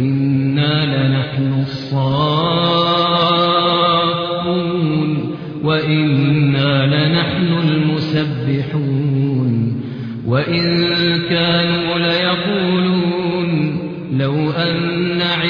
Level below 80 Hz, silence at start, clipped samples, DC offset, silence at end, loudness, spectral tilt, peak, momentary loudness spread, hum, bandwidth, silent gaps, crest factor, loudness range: -48 dBFS; 0 s; under 0.1%; under 0.1%; 0 s; -16 LUFS; -8.5 dB/octave; -2 dBFS; 6 LU; none; 5.4 kHz; none; 12 dB; 2 LU